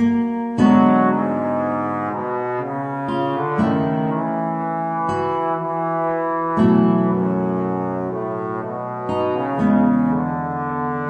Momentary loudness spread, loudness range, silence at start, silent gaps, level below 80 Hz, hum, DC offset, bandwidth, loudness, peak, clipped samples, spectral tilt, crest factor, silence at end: 9 LU; 3 LU; 0 s; none; -54 dBFS; none; under 0.1%; 8.2 kHz; -20 LUFS; -2 dBFS; under 0.1%; -9 dB/octave; 16 dB; 0 s